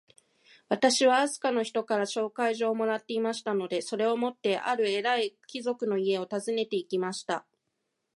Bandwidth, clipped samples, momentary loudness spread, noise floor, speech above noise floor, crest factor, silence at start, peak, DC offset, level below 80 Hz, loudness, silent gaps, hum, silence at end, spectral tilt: 11.5 kHz; under 0.1%; 8 LU; -81 dBFS; 52 dB; 20 dB; 0.7 s; -10 dBFS; under 0.1%; -84 dBFS; -29 LUFS; none; none; 0.75 s; -3.5 dB/octave